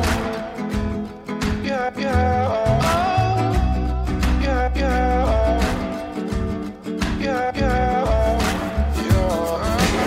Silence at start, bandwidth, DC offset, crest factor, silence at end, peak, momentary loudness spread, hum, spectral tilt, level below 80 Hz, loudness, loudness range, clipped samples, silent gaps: 0 s; 16 kHz; under 0.1%; 14 dB; 0 s; -6 dBFS; 8 LU; none; -6 dB/octave; -26 dBFS; -21 LUFS; 2 LU; under 0.1%; none